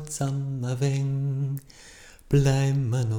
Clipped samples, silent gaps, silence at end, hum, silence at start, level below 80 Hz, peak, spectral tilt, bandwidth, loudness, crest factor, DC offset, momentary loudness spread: under 0.1%; none; 0 s; none; 0 s; -46 dBFS; -10 dBFS; -6.5 dB/octave; 16.5 kHz; -26 LUFS; 16 dB; under 0.1%; 9 LU